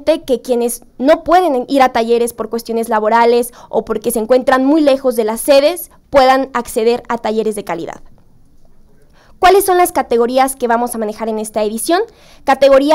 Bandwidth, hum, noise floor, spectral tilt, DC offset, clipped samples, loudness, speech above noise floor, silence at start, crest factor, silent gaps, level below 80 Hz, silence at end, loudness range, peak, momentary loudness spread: 16.5 kHz; none; -44 dBFS; -3.5 dB/octave; under 0.1%; under 0.1%; -14 LUFS; 31 dB; 0 s; 12 dB; none; -42 dBFS; 0 s; 4 LU; -2 dBFS; 9 LU